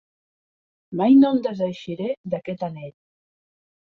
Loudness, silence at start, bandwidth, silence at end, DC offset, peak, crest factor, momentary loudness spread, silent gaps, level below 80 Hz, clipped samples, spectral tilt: -21 LUFS; 0.9 s; 4.8 kHz; 1.1 s; under 0.1%; -6 dBFS; 18 dB; 18 LU; 2.17-2.24 s; -66 dBFS; under 0.1%; -8.5 dB/octave